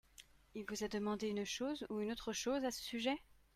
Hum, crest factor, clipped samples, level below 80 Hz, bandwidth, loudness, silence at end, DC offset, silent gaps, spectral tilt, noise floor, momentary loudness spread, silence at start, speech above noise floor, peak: none; 18 dB; under 0.1%; -68 dBFS; 16 kHz; -42 LUFS; 0.2 s; under 0.1%; none; -3.5 dB/octave; -64 dBFS; 11 LU; 0.2 s; 23 dB; -24 dBFS